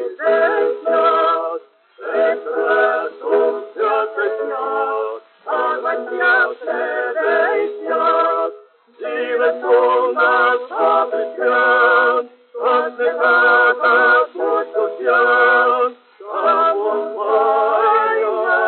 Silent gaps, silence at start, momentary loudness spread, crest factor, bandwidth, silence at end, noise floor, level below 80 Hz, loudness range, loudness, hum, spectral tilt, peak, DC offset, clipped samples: none; 0 s; 10 LU; 14 dB; 4.4 kHz; 0 s; -42 dBFS; under -90 dBFS; 5 LU; -16 LUFS; none; 2 dB/octave; -4 dBFS; under 0.1%; under 0.1%